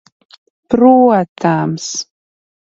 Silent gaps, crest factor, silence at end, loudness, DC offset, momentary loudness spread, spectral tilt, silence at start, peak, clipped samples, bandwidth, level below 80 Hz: 1.28-1.36 s; 14 dB; 0.65 s; -13 LUFS; under 0.1%; 14 LU; -5.5 dB/octave; 0.7 s; 0 dBFS; under 0.1%; 7.8 kHz; -52 dBFS